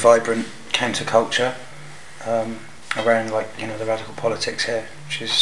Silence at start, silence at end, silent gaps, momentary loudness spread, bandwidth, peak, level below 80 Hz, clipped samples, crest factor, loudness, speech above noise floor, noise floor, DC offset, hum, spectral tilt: 0 s; 0 s; none; 15 LU; 12 kHz; 0 dBFS; -64 dBFS; under 0.1%; 20 dB; -22 LUFS; 20 dB; -41 dBFS; 1%; none; -3 dB/octave